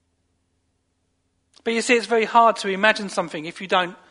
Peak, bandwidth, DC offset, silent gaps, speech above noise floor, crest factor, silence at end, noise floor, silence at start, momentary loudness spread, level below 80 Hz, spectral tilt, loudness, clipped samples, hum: -2 dBFS; 11 kHz; under 0.1%; none; 50 dB; 22 dB; 0.15 s; -70 dBFS; 1.65 s; 12 LU; -72 dBFS; -3 dB/octave; -20 LUFS; under 0.1%; none